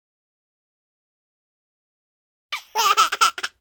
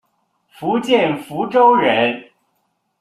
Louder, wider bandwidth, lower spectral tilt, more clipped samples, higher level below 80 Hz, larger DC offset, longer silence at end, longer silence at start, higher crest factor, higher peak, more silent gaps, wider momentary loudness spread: second, -19 LUFS vs -16 LUFS; first, 18 kHz vs 13.5 kHz; second, 2.5 dB/octave vs -5.5 dB/octave; neither; second, -74 dBFS vs -64 dBFS; neither; second, 0.15 s vs 0.8 s; first, 2.5 s vs 0.6 s; first, 24 dB vs 16 dB; about the same, -2 dBFS vs -2 dBFS; neither; first, 15 LU vs 12 LU